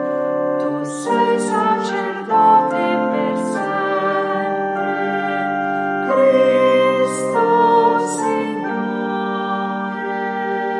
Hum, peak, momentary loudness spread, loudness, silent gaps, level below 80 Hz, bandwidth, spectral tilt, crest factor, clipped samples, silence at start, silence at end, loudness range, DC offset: none; -2 dBFS; 9 LU; -18 LUFS; none; -74 dBFS; 11.5 kHz; -5 dB/octave; 16 dB; under 0.1%; 0 s; 0 s; 3 LU; under 0.1%